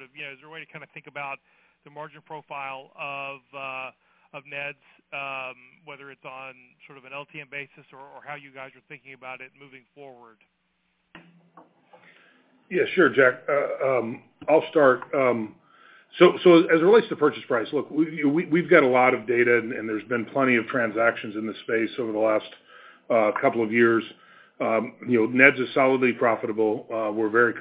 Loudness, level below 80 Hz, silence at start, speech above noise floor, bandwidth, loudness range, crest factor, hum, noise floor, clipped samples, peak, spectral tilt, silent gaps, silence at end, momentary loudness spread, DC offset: -22 LUFS; -76 dBFS; 0 s; 48 dB; 4 kHz; 19 LU; 24 dB; none; -72 dBFS; under 0.1%; 0 dBFS; -9.5 dB/octave; none; 0 s; 23 LU; under 0.1%